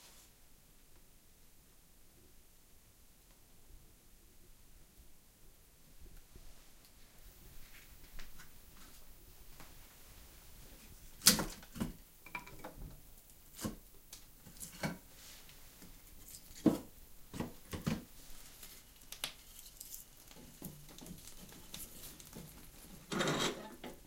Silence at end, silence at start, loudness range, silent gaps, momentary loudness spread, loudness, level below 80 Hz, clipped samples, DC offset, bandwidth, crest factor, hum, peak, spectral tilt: 0 s; 0 s; 26 LU; none; 26 LU; -40 LUFS; -58 dBFS; under 0.1%; under 0.1%; 17 kHz; 42 dB; none; -4 dBFS; -2.5 dB/octave